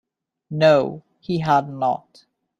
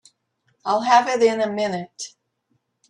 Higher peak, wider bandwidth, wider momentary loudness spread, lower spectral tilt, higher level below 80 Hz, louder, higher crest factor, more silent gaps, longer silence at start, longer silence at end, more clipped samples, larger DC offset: about the same, -2 dBFS vs -4 dBFS; second, 7.6 kHz vs 11 kHz; second, 15 LU vs 18 LU; first, -7 dB/octave vs -3.5 dB/octave; first, -60 dBFS vs -72 dBFS; about the same, -20 LUFS vs -20 LUFS; about the same, 20 dB vs 18 dB; neither; second, 0.5 s vs 0.65 s; second, 0.6 s vs 0.8 s; neither; neither